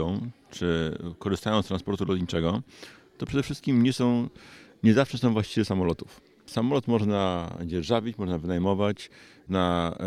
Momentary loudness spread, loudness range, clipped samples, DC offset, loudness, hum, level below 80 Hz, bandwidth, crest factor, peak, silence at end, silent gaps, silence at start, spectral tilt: 13 LU; 3 LU; under 0.1%; under 0.1%; -27 LUFS; none; -50 dBFS; 13.5 kHz; 20 dB; -8 dBFS; 0 s; none; 0 s; -6.5 dB/octave